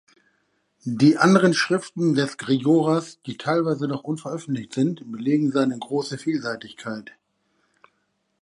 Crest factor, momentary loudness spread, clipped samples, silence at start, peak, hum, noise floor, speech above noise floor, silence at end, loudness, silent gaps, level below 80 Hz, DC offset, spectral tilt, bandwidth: 20 dB; 16 LU; under 0.1%; 0.85 s; -2 dBFS; none; -72 dBFS; 50 dB; 1.4 s; -22 LUFS; none; -70 dBFS; under 0.1%; -6 dB/octave; 11.5 kHz